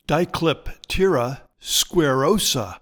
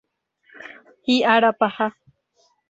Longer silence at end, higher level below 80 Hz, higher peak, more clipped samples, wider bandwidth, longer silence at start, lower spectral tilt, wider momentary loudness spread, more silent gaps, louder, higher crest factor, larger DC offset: second, 0.05 s vs 0.8 s; first, -38 dBFS vs -68 dBFS; about the same, -4 dBFS vs -2 dBFS; neither; first, 19 kHz vs 8 kHz; second, 0.1 s vs 0.6 s; about the same, -4 dB/octave vs -4.5 dB/octave; second, 10 LU vs 24 LU; neither; about the same, -20 LUFS vs -20 LUFS; about the same, 16 dB vs 20 dB; neither